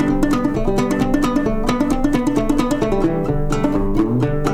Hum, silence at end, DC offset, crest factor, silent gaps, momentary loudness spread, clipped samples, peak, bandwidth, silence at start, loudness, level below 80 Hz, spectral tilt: none; 0 s; under 0.1%; 16 dB; none; 2 LU; under 0.1%; -2 dBFS; 15 kHz; 0 s; -18 LUFS; -24 dBFS; -7 dB/octave